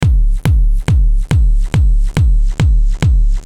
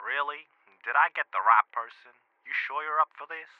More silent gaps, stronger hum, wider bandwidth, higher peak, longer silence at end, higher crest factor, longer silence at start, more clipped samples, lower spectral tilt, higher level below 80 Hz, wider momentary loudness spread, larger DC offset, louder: neither; neither; first, 10.5 kHz vs 6 kHz; first, 0 dBFS vs -6 dBFS; second, 0 s vs 0.15 s; second, 10 dB vs 22 dB; about the same, 0 s vs 0 s; neither; first, -7 dB/octave vs -1.5 dB/octave; first, -10 dBFS vs under -90 dBFS; second, 1 LU vs 17 LU; neither; first, -15 LUFS vs -27 LUFS